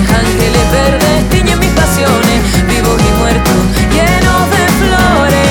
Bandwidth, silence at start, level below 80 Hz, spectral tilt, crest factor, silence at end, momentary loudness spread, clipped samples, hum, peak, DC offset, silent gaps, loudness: 19.5 kHz; 0 s; -16 dBFS; -5 dB/octave; 8 dB; 0 s; 2 LU; under 0.1%; none; 0 dBFS; under 0.1%; none; -9 LUFS